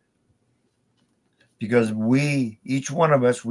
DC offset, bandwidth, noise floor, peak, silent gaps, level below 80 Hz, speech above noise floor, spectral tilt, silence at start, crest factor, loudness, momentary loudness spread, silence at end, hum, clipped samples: under 0.1%; 11.5 kHz; -68 dBFS; -6 dBFS; none; -70 dBFS; 47 dB; -6.5 dB/octave; 1.6 s; 18 dB; -21 LUFS; 8 LU; 0 s; none; under 0.1%